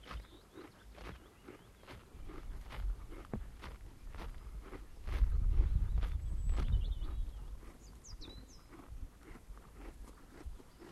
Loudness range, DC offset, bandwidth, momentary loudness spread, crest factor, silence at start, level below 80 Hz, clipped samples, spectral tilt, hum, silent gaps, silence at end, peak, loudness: 13 LU; under 0.1%; 12.5 kHz; 20 LU; 20 dB; 0 s; -40 dBFS; under 0.1%; -6.5 dB/octave; none; none; 0 s; -20 dBFS; -43 LUFS